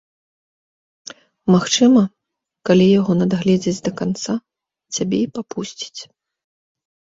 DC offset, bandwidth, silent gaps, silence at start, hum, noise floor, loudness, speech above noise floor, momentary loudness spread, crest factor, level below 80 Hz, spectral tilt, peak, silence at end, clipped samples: under 0.1%; 7.8 kHz; none; 1.45 s; none; -80 dBFS; -18 LUFS; 63 dB; 17 LU; 18 dB; -56 dBFS; -5.5 dB/octave; -2 dBFS; 1.15 s; under 0.1%